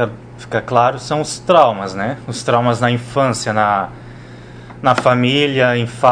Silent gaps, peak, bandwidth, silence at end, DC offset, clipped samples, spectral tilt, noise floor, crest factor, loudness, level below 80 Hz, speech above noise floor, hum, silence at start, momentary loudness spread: none; 0 dBFS; 10 kHz; 0 s; under 0.1%; under 0.1%; -5 dB/octave; -35 dBFS; 16 dB; -16 LUFS; -48 dBFS; 20 dB; none; 0 s; 22 LU